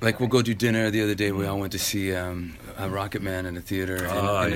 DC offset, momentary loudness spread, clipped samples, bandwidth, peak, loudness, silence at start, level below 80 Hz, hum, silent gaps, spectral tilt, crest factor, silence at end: under 0.1%; 9 LU; under 0.1%; 16.5 kHz; -4 dBFS; -26 LUFS; 0 s; -50 dBFS; none; none; -5 dB/octave; 20 dB; 0 s